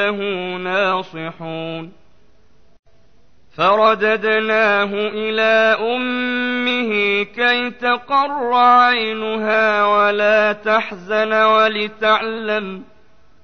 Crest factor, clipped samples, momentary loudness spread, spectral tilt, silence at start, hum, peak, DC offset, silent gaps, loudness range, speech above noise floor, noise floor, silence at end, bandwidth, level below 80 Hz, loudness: 14 dB; under 0.1%; 10 LU; -5 dB/octave; 0 s; none; -4 dBFS; 0.6%; 2.79-2.83 s; 6 LU; 39 dB; -56 dBFS; 0.6 s; 6.6 kHz; -60 dBFS; -16 LUFS